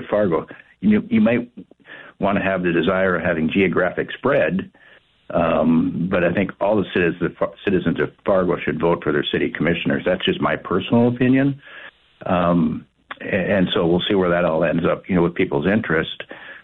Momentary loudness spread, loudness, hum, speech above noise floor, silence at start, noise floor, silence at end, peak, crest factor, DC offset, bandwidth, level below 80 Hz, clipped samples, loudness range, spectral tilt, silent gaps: 9 LU; -20 LUFS; none; 23 dB; 0 s; -42 dBFS; 0.05 s; -8 dBFS; 12 dB; under 0.1%; 4.2 kHz; -48 dBFS; under 0.1%; 1 LU; -9.5 dB/octave; none